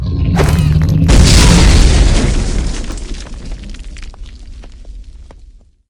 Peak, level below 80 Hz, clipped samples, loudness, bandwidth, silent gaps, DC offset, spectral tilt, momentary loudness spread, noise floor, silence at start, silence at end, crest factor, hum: 0 dBFS; -14 dBFS; 0.5%; -11 LUFS; 16.5 kHz; none; under 0.1%; -5 dB/octave; 24 LU; -40 dBFS; 0 s; 0.55 s; 12 dB; none